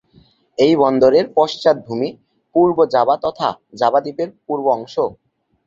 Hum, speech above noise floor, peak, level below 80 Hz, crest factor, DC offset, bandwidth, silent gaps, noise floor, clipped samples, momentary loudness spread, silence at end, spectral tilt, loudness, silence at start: none; 37 dB; -2 dBFS; -56 dBFS; 16 dB; under 0.1%; 7.6 kHz; none; -53 dBFS; under 0.1%; 11 LU; 0.55 s; -6.5 dB/octave; -17 LUFS; 0.6 s